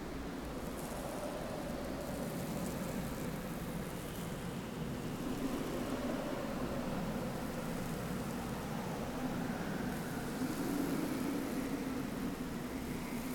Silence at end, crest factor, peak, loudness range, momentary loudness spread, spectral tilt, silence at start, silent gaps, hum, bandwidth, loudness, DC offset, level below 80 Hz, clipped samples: 0 s; 14 dB; -24 dBFS; 3 LU; 4 LU; -5.5 dB/octave; 0 s; none; none; 19.5 kHz; -40 LUFS; under 0.1%; -52 dBFS; under 0.1%